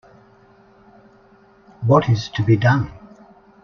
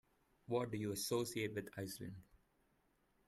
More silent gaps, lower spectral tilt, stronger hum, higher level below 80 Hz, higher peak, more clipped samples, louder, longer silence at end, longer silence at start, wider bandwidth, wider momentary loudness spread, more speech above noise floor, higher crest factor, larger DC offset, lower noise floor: neither; first, -7.5 dB/octave vs -4.5 dB/octave; neither; first, -50 dBFS vs -74 dBFS; first, -2 dBFS vs -26 dBFS; neither; first, -18 LUFS vs -43 LUFS; second, 0.7 s vs 1.05 s; first, 1.8 s vs 0.5 s; second, 6.6 kHz vs 15.5 kHz; about the same, 9 LU vs 11 LU; about the same, 35 dB vs 36 dB; about the same, 20 dB vs 20 dB; neither; second, -51 dBFS vs -78 dBFS